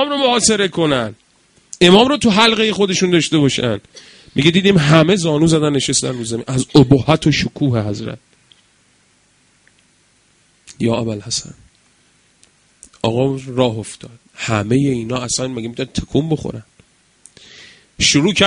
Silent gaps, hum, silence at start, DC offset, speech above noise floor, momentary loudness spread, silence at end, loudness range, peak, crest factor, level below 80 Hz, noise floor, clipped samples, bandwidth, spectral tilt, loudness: none; none; 0 s; under 0.1%; 41 dB; 13 LU; 0 s; 12 LU; 0 dBFS; 16 dB; -44 dBFS; -56 dBFS; under 0.1%; 11 kHz; -4.5 dB/octave; -15 LUFS